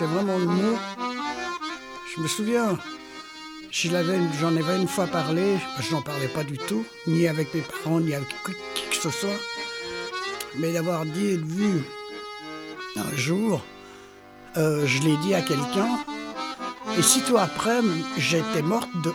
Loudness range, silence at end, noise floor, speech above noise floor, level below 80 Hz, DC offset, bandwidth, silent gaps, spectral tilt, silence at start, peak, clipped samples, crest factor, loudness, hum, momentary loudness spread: 5 LU; 0 s; -47 dBFS; 22 dB; -64 dBFS; under 0.1%; 18 kHz; none; -4.5 dB/octave; 0 s; -2 dBFS; under 0.1%; 24 dB; -25 LUFS; none; 13 LU